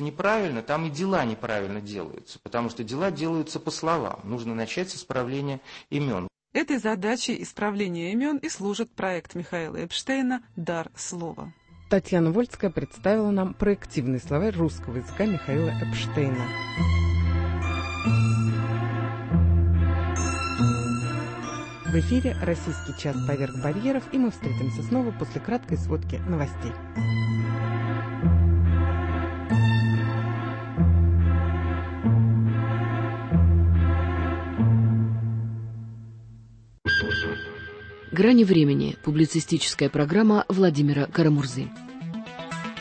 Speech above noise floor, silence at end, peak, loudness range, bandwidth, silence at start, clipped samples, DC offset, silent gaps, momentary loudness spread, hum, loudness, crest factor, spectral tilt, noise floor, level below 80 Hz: 24 dB; 0 s; -8 dBFS; 7 LU; 8.8 kHz; 0 s; under 0.1%; under 0.1%; none; 12 LU; none; -25 LUFS; 16 dB; -6.5 dB/octave; -49 dBFS; -36 dBFS